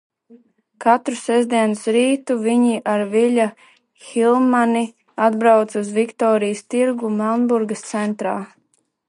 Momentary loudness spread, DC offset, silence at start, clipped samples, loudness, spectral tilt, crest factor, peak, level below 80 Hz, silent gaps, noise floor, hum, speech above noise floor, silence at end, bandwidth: 8 LU; under 0.1%; 0.8 s; under 0.1%; -18 LUFS; -5 dB/octave; 16 dB; -2 dBFS; -74 dBFS; none; -65 dBFS; none; 47 dB; 0.6 s; 11.5 kHz